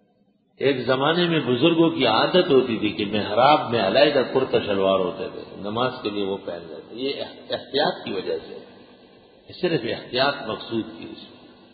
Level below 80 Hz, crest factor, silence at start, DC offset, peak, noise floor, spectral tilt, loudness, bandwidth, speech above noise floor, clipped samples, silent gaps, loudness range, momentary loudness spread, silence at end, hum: -58 dBFS; 20 dB; 0.6 s; under 0.1%; -2 dBFS; -63 dBFS; -10 dB/octave; -22 LUFS; 5 kHz; 41 dB; under 0.1%; none; 9 LU; 16 LU; 0.4 s; none